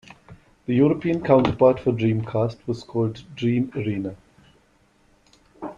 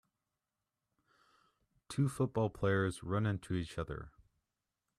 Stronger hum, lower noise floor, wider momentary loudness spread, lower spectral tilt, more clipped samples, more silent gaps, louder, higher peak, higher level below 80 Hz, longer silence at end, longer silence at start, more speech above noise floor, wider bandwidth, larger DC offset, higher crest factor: neither; second, -60 dBFS vs -90 dBFS; about the same, 12 LU vs 11 LU; first, -9 dB/octave vs -7 dB/octave; neither; neither; first, -22 LUFS vs -36 LUFS; first, -2 dBFS vs -20 dBFS; first, -52 dBFS vs -60 dBFS; second, 0.05 s vs 0.9 s; second, 0.3 s vs 1.9 s; second, 39 dB vs 55 dB; second, 7.6 kHz vs 13 kHz; neither; about the same, 20 dB vs 18 dB